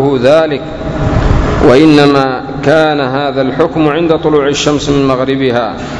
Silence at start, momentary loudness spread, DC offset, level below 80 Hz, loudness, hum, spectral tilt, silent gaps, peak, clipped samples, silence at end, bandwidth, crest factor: 0 s; 9 LU; under 0.1%; -22 dBFS; -10 LUFS; none; -6 dB/octave; none; 0 dBFS; 2%; 0 s; 11 kHz; 10 dB